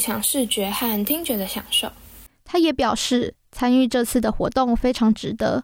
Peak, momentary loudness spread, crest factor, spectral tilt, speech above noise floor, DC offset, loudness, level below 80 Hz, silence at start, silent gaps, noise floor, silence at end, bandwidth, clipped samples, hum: -8 dBFS; 6 LU; 12 dB; -3.5 dB/octave; 24 dB; under 0.1%; -21 LUFS; -40 dBFS; 0 s; none; -45 dBFS; 0 s; 17 kHz; under 0.1%; none